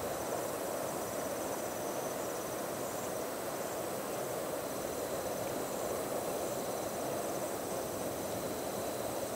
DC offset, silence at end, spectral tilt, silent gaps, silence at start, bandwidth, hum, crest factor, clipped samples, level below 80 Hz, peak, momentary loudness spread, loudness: under 0.1%; 0 s; -3.5 dB/octave; none; 0 s; 16 kHz; none; 14 dB; under 0.1%; -66 dBFS; -24 dBFS; 1 LU; -37 LUFS